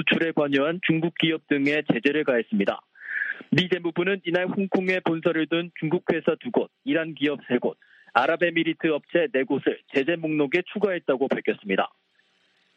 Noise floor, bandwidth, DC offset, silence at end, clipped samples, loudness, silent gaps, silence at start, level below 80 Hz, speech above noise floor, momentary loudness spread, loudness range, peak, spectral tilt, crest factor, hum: -66 dBFS; 7.8 kHz; under 0.1%; 0.9 s; under 0.1%; -25 LUFS; none; 0 s; -70 dBFS; 41 dB; 4 LU; 2 LU; -2 dBFS; -7 dB/octave; 22 dB; none